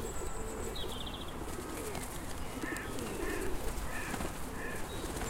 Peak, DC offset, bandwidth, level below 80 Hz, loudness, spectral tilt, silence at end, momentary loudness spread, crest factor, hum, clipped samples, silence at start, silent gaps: -20 dBFS; under 0.1%; 16 kHz; -44 dBFS; -40 LUFS; -4 dB/octave; 0 s; 4 LU; 18 dB; none; under 0.1%; 0 s; none